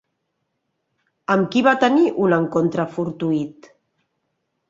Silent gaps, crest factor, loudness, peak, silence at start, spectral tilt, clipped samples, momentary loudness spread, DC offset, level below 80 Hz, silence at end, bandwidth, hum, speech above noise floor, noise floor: none; 20 dB; -19 LUFS; -2 dBFS; 1.3 s; -7 dB/octave; under 0.1%; 9 LU; under 0.1%; -64 dBFS; 1.2 s; 7.6 kHz; none; 56 dB; -74 dBFS